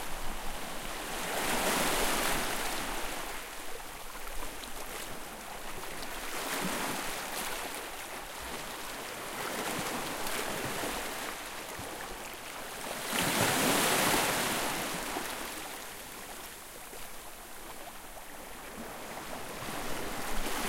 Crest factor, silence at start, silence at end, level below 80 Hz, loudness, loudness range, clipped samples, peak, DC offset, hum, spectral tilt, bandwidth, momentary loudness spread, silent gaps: 22 dB; 0 s; 0 s; -48 dBFS; -34 LUFS; 12 LU; under 0.1%; -14 dBFS; under 0.1%; none; -2 dB/octave; 16.5 kHz; 16 LU; none